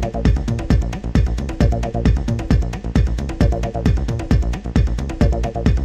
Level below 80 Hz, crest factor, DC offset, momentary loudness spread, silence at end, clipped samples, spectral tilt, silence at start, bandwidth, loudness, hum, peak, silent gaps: -20 dBFS; 14 dB; under 0.1%; 2 LU; 0 s; under 0.1%; -7.5 dB/octave; 0 s; 8.6 kHz; -20 LUFS; none; -2 dBFS; none